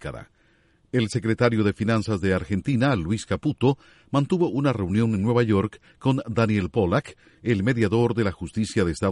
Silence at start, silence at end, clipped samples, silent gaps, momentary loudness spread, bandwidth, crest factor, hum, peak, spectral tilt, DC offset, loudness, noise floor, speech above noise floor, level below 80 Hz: 0 s; 0 s; under 0.1%; none; 6 LU; 11.5 kHz; 16 dB; none; -6 dBFS; -7 dB/octave; under 0.1%; -24 LUFS; -61 dBFS; 38 dB; -48 dBFS